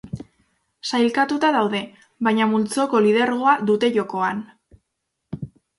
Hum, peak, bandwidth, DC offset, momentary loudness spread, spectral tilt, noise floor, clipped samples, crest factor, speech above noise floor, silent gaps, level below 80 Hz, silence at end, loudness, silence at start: none; -4 dBFS; 11.5 kHz; under 0.1%; 17 LU; -5 dB/octave; -77 dBFS; under 0.1%; 16 dB; 58 dB; none; -58 dBFS; 0.3 s; -20 LUFS; 0.05 s